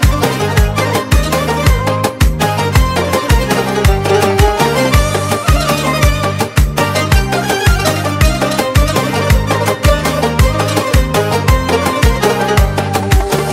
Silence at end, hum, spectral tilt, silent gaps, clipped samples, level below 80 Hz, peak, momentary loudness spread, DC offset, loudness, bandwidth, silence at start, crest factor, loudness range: 0 s; none; -5 dB/octave; none; under 0.1%; -16 dBFS; 0 dBFS; 3 LU; under 0.1%; -13 LUFS; 16.5 kHz; 0 s; 12 dB; 1 LU